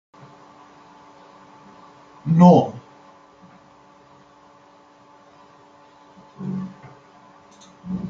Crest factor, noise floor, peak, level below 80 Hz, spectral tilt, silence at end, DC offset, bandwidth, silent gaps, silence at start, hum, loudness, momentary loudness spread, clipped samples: 22 dB; -51 dBFS; -2 dBFS; -64 dBFS; -9.5 dB/octave; 0 s; under 0.1%; 7 kHz; none; 2.25 s; none; -18 LUFS; 29 LU; under 0.1%